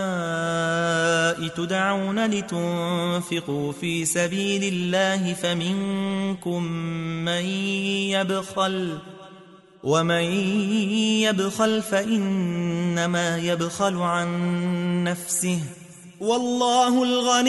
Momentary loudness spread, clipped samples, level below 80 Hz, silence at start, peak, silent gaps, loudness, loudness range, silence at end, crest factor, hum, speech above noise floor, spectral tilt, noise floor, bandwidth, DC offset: 7 LU; under 0.1%; -64 dBFS; 0 s; -6 dBFS; none; -23 LUFS; 3 LU; 0 s; 18 dB; none; 25 dB; -4.5 dB/octave; -48 dBFS; 12 kHz; under 0.1%